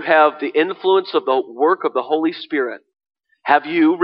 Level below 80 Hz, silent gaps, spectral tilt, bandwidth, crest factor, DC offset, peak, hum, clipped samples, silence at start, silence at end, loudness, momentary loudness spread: -74 dBFS; none; -7.5 dB/octave; 5.6 kHz; 16 dB; under 0.1%; -2 dBFS; none; under 0.1%; 0 s; 0 s; -18 LUFS; 8 LU